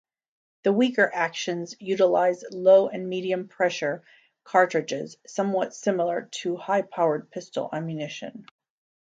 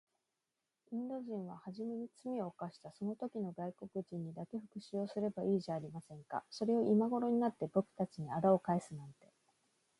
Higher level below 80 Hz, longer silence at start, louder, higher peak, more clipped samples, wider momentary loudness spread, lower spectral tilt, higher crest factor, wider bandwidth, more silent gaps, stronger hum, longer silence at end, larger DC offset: about the same, -78 dBFS vs -80 dBFS; second, 0.65 s vs 0.9 s; first, -25 LUFS vs -39 LUFS; first, -6 dBFS vs -18 dBFS; neither; about the same, 12 LU vs 14 LU; second, -5 dB/octave vs -8 dB/octave; about the same, 20 dB vs 20 dB; second, 7.8 kHz vs 11.5 kHz; neither; neither; second, 0.7 s vs 0.85 s; neither